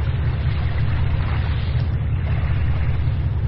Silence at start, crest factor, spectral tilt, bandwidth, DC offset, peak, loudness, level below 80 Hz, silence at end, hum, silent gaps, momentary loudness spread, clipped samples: 0 s; 10 dB; -10.5 dB/octave; 5.4 kHz; under 0.1%; -8 dBFS; -22 LUFS; -24 dBFS; 0 s; none; none; 1 LU; under 0.1%